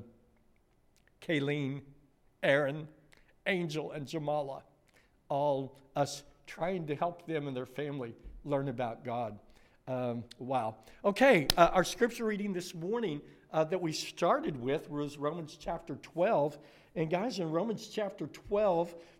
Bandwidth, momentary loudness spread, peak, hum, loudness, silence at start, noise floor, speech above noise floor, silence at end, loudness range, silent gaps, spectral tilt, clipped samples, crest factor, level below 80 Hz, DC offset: 16 kHz; 13 LU; -6 dBFS; none; -33 LUFS; 0 s; -68 dBFS; 35 dB; 0.15 s; 7 LU; none; -5 dB/octave; under 0.1%; 28 dB; -58 dBFS; under 0.1%